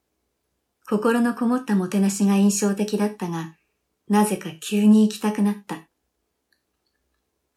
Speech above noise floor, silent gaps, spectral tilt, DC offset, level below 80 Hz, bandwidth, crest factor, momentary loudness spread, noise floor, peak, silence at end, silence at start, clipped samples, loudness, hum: 55 dB; none; -5.5 dB/octave; under 0.1%; -72 dBFS; 14.5 kHz; 16 dB; 13 LU; -75 dBFS; -8 dBFS; 1.75 s; 0.9 s; under 0.1%; -21 LUFS; none